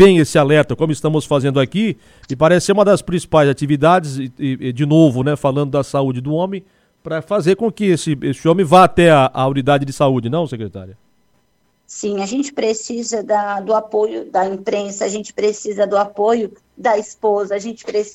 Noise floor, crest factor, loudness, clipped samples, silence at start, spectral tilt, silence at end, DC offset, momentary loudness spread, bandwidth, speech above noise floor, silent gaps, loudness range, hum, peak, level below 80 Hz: -62 dBFS; 16 dB; -16 LUFS; under 0.1%; 0 s; -6 dB/octave; 0.05 s; under 0.1%; 11 LU; 14.5 kHz; 47 dB; none; 6 LU; none; 0 dBFS; -48 dBFS